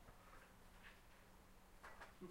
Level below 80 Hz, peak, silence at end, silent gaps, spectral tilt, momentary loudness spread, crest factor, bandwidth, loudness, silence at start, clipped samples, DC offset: -68 dBFS; -44 dBFS; 0 s; none; -4.5 dB/octave; 7 LU; 18 dB; 16 kHz; -64 LUFS; 0 s; under 0.1%; under 0.1%